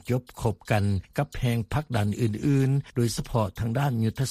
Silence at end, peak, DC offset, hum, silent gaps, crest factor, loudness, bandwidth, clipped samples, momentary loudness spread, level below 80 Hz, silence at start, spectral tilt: 0 s; -10 dBFS; under 0.1%; none; none; 16 dB; -27 LUFS; 15 kHz; under 0.1%; 5 LU; -46 dBFS; 0.05 s; -6.5 dB/octave